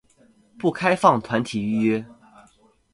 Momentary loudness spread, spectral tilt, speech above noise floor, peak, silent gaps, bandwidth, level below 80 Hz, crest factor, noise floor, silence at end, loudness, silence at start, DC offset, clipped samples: 8 LU; -6 dB/octave; 37 dB; 0 dBFS; none; 11.5 kHz; -60 dBFS; 24 dB; -58 dBFS; 0.8 s; -22 LUFS; 0.6 s; under 0.1%; under 0.1%